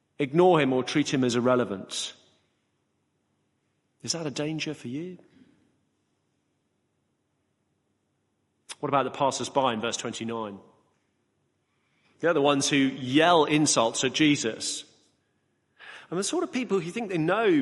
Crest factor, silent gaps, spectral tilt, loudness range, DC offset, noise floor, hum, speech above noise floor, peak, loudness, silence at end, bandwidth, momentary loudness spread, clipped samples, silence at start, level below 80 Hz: 20 dB; none; -4 dB/octave; 12 LU; under 0.1%; -75 dBFS; none; 50 dB; -8 dBFS; -26 LUFS; 0 s; 11.5 kHz; 15 LU; under 0.1%; 0.2 s; -70 dBFS